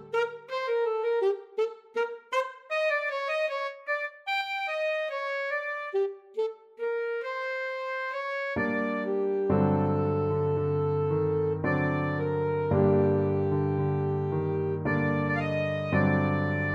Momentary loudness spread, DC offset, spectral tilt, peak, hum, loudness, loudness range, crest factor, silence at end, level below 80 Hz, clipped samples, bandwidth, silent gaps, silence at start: 7 LU; under 0.1%; -8 dB/octave; -10 dBFS; none; -28 LUFS; 5 LU; 18 dB; 0 s; -62 dBFS; under 0.1%; 8 kHz; none; 0 s